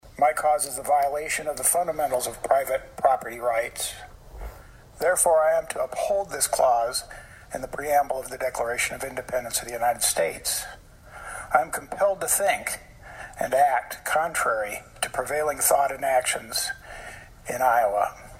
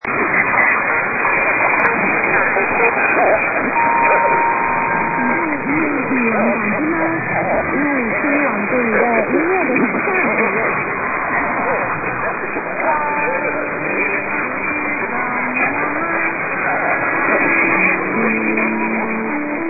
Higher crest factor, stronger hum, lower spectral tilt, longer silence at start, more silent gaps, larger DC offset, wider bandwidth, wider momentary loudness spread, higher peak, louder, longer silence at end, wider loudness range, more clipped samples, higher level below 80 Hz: about the same, 20 dB vs 16 dB; neither; second, -1 dB/octave vs -11.5 dB/octave; about the same, 0.05 s vs 0.05 s; neither; neither; first, 16 kHz vs 3.1 kHz; first, 16 LU vs 6 LU; second, -6 dBFS vs 0 dBFS; second, -24 LUFS vs -16 LUFS; about the same, 0 s vs 0 s; about the same, 3 LU vs 4 LU; neither; about the same, -50 dBFS vs -50 dBFS